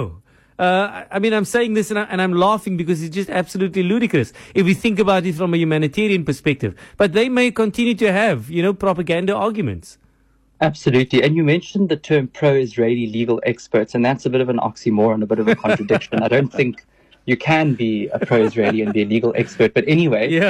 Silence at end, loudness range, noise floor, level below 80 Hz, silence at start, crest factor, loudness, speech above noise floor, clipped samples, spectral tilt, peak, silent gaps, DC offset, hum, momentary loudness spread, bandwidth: 0 s; 1 LU; -57 dBFS; -52 dBFS; 0 s; 12 dB; -18 LUFS; 40 dB; under 0.1%; -6.5 dB/octave; -6 dBFS; none; under 0.1%; none; 6 LU; 14.5 kHz